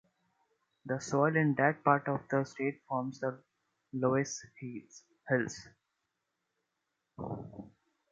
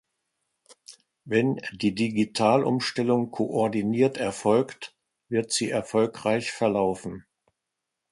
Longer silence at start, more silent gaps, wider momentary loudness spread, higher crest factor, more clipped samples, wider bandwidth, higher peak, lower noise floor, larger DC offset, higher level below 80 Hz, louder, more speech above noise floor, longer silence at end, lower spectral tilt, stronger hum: about the same, 0.85 s vs 0.9 s; neither; first, 20 LU vs 7 LU; about the same, 24 dB vs 20 dB; neither; second, 9.2 kHz vs 11.5 kHz; about the same, -10 dBFS vs -8 dBFS; about the same, -85 dBFS vs -84 dBFS; neither; second, -70 dBFS vs -62 dBFS; second, -33 LUFS vs -25 LUFS; second, 52 dB vs 59 dB; second, 0.45 s vs 0.9 s; about the same, -6 dB/octave vs -5 dB/octave; neither